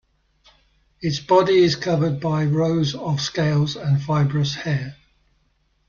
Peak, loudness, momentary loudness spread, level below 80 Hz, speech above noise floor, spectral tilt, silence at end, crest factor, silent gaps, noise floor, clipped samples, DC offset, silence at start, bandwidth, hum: -4 dBFS; -20 LUFS; 9 LU; -54 dBFS; 45 dB; -6.5 dB/octave; 0.95 s; 18 dB; none; -65 dBFS; under 0.1%; under 0.1%; 1 s; 7.2 kHz; none